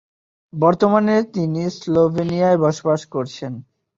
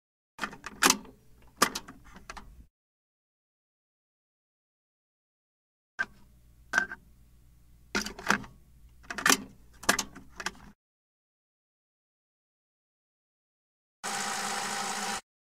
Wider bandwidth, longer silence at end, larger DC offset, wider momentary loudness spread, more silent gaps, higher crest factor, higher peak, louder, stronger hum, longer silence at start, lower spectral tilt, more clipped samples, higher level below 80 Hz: second, 7.8 kHz vs 16 kHz; about the same, 0.35 s vs 0.25 s; neither; second, 14 LU vs 22 LU; second, none vs 2.70-5.98 s, 10.75-14.03 s; second, 16 dB vs 30 dB; first, -2 dBFS vs -6 dBFS; first, -18 LUFS vs -30 LUFS; neither; first, 0.55 s vs 0.4 s; first, -7 dB/octave vs -1 dB/octave; neither; about the same, -56 dBFS vs -60 dBFS